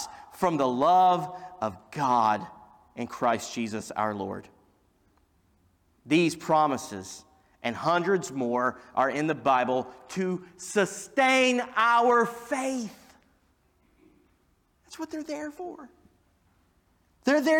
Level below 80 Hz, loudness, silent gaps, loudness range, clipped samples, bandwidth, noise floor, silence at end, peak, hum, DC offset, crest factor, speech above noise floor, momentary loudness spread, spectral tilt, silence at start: -68 dBFS; -26 LUFS; none; 15 LU; under 0.1%; 18.5 kHz; -68 dBFS; 0 s; -12 dBFS; none; under 0.1%; 16 dB; 42 dB; 18 LU; -4.5 dB/octave; 0 s